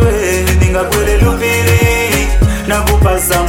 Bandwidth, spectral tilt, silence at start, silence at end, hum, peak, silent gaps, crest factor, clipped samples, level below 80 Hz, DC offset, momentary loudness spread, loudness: 17 kHz; -5 dB/octave; 0 s; 0 s; none; 0 dBFS; none; 10 dB; under 0.1%; -16 dBFS; under 0.1%; 3 LU; -11 LUFS